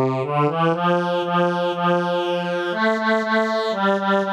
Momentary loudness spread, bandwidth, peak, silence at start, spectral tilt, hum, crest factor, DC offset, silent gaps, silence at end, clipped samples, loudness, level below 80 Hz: 3 LU; 11.5 kHz; -8 dBFS; 0 s; -6.5 dB/octave; none; 12 dB; under 0.1%; none; 0 s; under 0.1%; -20 LUFS; -70 dBFS